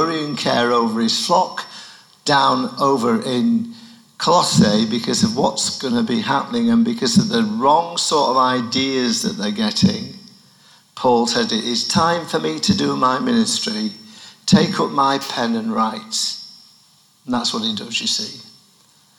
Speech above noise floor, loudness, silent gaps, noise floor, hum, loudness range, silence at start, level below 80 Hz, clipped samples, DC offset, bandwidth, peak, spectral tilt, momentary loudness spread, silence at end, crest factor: 36 dB; -18 LUFS; none; -54 dBFS; none; 3 LU; 0 s; -56 dBFS; under 0.1%; under 0.1%; 18.5 kHz; -2 dBFS; -4 dB/octave; 8 LU; 0.75 s; 18 dB